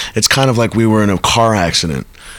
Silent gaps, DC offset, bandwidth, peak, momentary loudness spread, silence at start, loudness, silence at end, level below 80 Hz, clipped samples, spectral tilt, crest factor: none; under 0.1%; 19 kHz; 0 dBFS; 5 LU; 0 s; -12 LUFS; 0 s; -36 dBFS; under 0.1%; -4 dB/octave; 12 dB